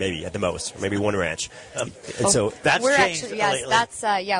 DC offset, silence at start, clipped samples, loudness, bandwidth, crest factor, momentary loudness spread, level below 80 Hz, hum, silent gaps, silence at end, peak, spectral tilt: under 0.1%; 0 s; under 0.1%; -22 LUFS; 11 kHz; 18 dB; 12 LU; -52 dBFS; none; none; 0 s; -6 dBFS; -3 dB/octave